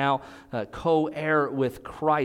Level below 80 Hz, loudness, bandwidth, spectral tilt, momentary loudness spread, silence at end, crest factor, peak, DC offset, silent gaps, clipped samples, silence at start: -56 dBFS; -27 LUFS; 16 kHz; -7 dB/octave; 10 LU; 0 s; 16 dB; -10 dBFS; under 0.1%; none; under 0.1%; 0 s